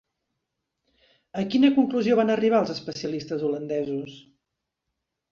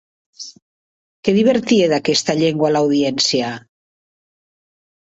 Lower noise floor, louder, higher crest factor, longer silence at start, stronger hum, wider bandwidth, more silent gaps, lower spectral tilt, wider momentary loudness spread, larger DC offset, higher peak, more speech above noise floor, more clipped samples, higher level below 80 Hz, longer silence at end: second, -83 dBFS vs under -90 dBFS; second, -24 LUFS vs -16 LUFS; about the same, 18 dB vs 18 dB; first, 1.35 s vs 0.4 s; neither; second, 7.2 kHz vs 8.2 kHz; second, none vs 0.62-1.23 s; first, -6.5 dB/octave vs -4.5 dB/octave; second, 12 LU vs 20 LU; neither; second, -8 dBFS vs -2 dBFS; second, 59 dB vs over 74 dB; neither; second, -66 dBFS vs -58 dBFS; second, 1.1 s vs 1.45 s